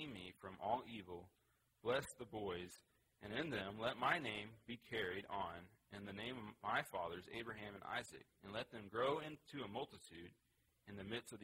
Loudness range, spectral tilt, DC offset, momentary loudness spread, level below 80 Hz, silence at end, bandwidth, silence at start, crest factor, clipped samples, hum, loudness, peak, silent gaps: 3 LU; -4.5 dB/octave; under 0.1%; 16 LU; -74 dBFS; 0 s; 16 kHz; 0 s; 24 dB; under 0.1%; none; -46 LUFS; -24 dBFS; none